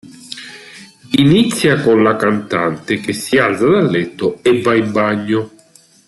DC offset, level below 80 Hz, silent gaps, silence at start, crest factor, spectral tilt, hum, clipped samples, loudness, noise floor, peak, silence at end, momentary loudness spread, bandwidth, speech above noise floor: under 0.1%; -52 dBFS; none; 0.05 s; 14 dB; -5.5 dB/octave; none; under 0.1%; -14 LUFS; -48 dBFS; -2 dBFS; 0.6 s; 18 LU; 12.5 kHz; 34 dB